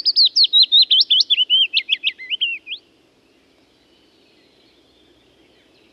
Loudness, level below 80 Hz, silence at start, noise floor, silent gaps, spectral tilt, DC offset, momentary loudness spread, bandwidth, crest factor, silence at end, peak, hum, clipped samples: -13 LUFS; -74 dBFS; 0.05 s; -56 dBFS; none; 2.5 dB/octave; under 0.1%; 14 LU; 12 kHz; 16 dB; 3.15 s; -4 dBFS; none; under 0.1%